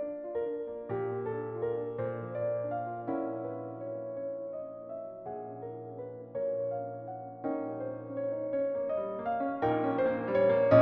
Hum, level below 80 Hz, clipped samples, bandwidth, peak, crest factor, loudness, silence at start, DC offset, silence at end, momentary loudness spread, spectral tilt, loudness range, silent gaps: none; -68 dBFS; under 0.1%; 5.4 kHz; -10 dBFS; 24 dB; -34 LUFS; 0 s; under 0.1%; 0 s; 12 LU; -7 dB/octave; 7 LU; none